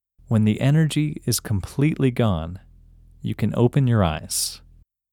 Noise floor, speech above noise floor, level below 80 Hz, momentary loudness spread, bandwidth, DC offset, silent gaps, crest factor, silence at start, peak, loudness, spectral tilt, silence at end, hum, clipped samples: -49 dBFS; 29 dB; -44 dBFS; 12 LU; 18.5 kHz; under 0.1%; none; 18 dB; 0.3 s; -4 dBFS; -22 LUFS; -6 dB/octave; 0.55 s; none; under 0.1%